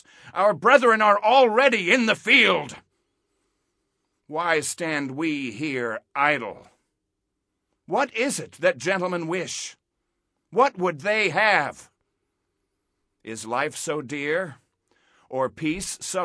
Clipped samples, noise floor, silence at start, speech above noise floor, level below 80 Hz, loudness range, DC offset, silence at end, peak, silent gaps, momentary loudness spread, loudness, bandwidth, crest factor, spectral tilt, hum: under 0.1%; -80 dBFS; 0.25 s; 57 dB; -64 dBFS; 10 LU; under 0.1%; 0 s; -4 dBFS; none; 14 LU; -22 LUFS; 11 kHz; 22 dB; -3.5 dB/octave; none